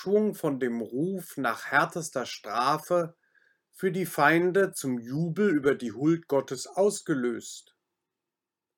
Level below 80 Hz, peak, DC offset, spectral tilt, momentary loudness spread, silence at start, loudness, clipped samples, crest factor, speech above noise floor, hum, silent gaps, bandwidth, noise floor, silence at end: -78 dBFS; -8 dBFS; under 0.1%; -5 dB/octave; 9 LU; 0 s; -28 LUFS; under 0.1%; 20 dB; 61 dB; none; none; 19.5 kHz; -89 dBFS; 1.15 s